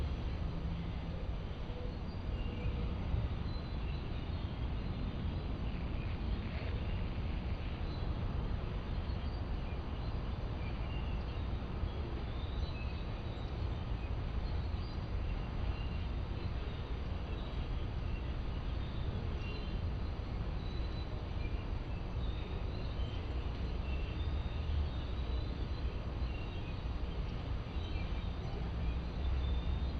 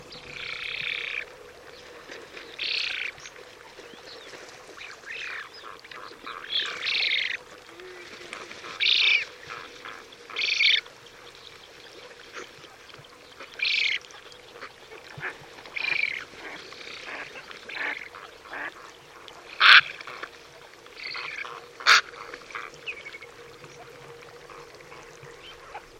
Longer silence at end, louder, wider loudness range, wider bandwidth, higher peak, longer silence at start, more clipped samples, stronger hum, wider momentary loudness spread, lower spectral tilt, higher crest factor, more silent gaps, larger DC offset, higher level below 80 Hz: about the same, 0 s vs 0 s; second, -41 LUFS vs -24 LUFS; second, 1 LU vs 13 LU; second, 6.4 kHz vs 16.5 kHz; second, -24 dBFS vs 0 dBFS; about the same, 0 s vs 0 s; neither; neither; second, 3 LU vs 25 LU; first, -8 dB/octave vs 0 dB/octave; second, 14 dB vs 30 dB; neither; neither; first, -40 dBFS vs -68 dBFS